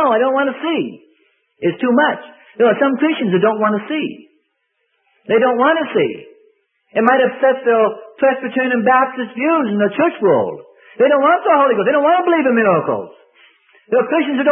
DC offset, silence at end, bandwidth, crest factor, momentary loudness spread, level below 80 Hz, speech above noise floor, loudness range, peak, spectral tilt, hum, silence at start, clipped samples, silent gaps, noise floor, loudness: under 0.1%; 0 s; 3.8 kHz; 16 dB; 9 LU; -70 dBFS; 54 dB; 3 LU; 0 dBFS; -9.5 dB/octave; none; 0 s; under 0.1%; none; -68 dBFS; -15 LUFS